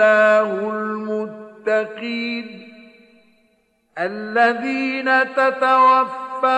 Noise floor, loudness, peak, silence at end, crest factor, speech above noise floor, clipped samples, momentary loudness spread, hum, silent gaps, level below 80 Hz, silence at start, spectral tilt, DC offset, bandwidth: -63 dBFS; -18 LUFS; -2 dBFS; 0 s; 16 dB; 45 dB; under 0.1%; 13 LU; none; none; -74 dBFS; 0 s; -5 dB/octave; under 0.1%; 9 kHz